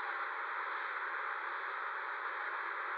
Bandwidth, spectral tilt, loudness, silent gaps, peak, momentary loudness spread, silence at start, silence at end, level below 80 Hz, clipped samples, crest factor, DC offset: 7.2 kHz; 7 dB/octave; -39 LUFS; none; -28 dBFS; 1 LU; 0 s; 0 s; under -90 dBFS; under 0.1%; 12 dB; under 0.1%